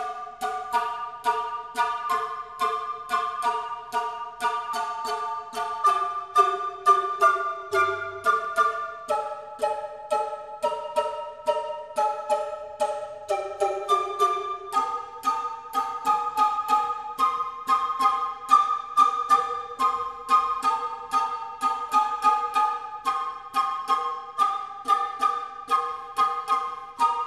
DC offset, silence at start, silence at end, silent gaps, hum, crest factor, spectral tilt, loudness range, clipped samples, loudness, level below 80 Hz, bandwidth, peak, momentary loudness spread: under 0.1%; 0 s; 0 s; none; none; 20 dB; -2 dB/octave; 5 LU; under 0.1%; -26 LUFS; -68 dBFS; 14 kHz; -6 dBFS; 9 LU